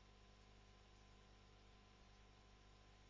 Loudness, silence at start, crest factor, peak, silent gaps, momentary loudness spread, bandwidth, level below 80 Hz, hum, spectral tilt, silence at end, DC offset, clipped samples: -69 LUFS; 0 s; 12 dB; -54 dBFS; none; 0 LU; 7.2 kHz; -70 dBFS; 50 Hz at -70 dBFS; -3.5 dB/octave; 0 s; under 0.1%; under 0.1%